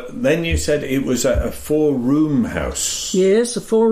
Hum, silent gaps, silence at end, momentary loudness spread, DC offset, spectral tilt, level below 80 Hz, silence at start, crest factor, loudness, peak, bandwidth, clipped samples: none; none; 0 s; 5 LU; under 0.1%; -4.5 dB/octave; -32 dBFS; 0 s; 12 dB; -18 LUFS; -6 dBFS; 15.5 kHz; under 0.1%